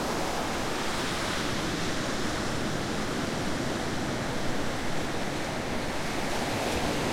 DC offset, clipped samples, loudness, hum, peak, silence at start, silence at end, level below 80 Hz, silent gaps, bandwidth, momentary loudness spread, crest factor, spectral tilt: under 0.1%; under 0.1%; -30 LUFS; none; -16 dBFS; 0 s; 0 s; -44 dBFS; none; 16.5 kHz; 3 LU; 14 dB; -4 dB/octave